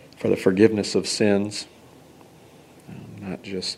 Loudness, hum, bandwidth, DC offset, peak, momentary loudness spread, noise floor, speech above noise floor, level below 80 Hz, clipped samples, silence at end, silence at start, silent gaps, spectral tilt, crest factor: -22 LUFS; none; 14 kHz; under 0.1%; -2 dBFS; 23 LU; -49 dBFS; 28 dB; -64 dBFS; under 0.1%; 0 s; 0.2 s; none; -5 dB/octave; 22 dB